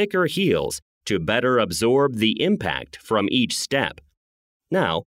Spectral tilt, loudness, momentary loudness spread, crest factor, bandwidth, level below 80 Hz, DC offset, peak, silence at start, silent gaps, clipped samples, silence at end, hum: -4.5 dB/octave; -22 LUFS; 8 LU; 18 dB; 16 kHz; -52 dBFS; under 0.1%; -4 dBFS; 0 s; 0.82-1.01 s, 4.17-4.60 s; under 0.1%; 0.05 s; none